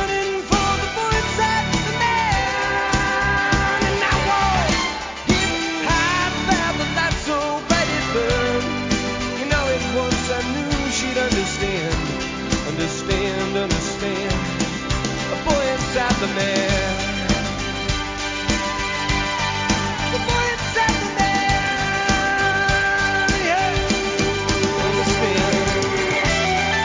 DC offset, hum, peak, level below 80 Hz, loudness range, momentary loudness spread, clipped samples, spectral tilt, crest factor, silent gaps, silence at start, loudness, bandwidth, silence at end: under 0.1%; none; -4 dBFS; -32 dBFS; 3 LU; 5 LU; under 0.1%; -4 dB/octave; 16 dB; none; 0 s; -20 LUFS; 7.8 kHz; 0 s